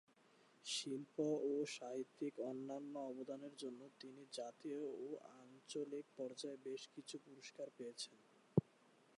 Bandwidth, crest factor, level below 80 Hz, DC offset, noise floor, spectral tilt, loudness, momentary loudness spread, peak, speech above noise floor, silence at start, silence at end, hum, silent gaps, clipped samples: 11.5 kHz; 28 dB; -82 dBFS; under 0.1%; -72 dBFS; -5 dB/octave; -47 LUFS; 13 LU; -20 dBFS; 24 dB; 0.65 s; 0.55 s; none; none; under 0.1%